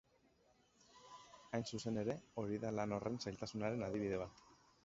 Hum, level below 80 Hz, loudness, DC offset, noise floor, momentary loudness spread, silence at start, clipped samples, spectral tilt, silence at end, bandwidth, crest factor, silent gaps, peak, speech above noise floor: none; -70 dBFS; -43 LUFS; under 0.1%; -74 dBFS; 18 LU; 0.95 s; under 0.1%; -6 dB/octave; 0.3 s; 7.6 kHz; 18 dB; none; -26 dBFS; 32 dB